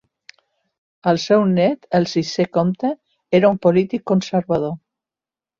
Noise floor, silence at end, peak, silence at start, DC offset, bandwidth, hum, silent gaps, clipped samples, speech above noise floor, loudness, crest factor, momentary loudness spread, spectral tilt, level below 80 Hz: under -90 dBFS; 0.8 s; -2 dBFS; 1.05 s; under 0.1%; 7.4 kHz; none; none; under 0.1%; over 73 dB; -18 LUFS; 16 dB; 10 LU; -6.5 dB/octave; -58 dBFS